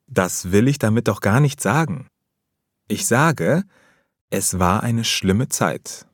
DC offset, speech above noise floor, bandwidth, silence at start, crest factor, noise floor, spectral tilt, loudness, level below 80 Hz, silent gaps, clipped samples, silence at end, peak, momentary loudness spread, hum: under 0.1%; 58 dB; 18.5 kHz; 0.1 s; 18 dB; -77 dBFS; -5 dB/octave; -19 LUFS; -50 dBFS; 4.21-4.28 s; under 0.1%; 0.1 s; -2 dBFS; 9 LU; none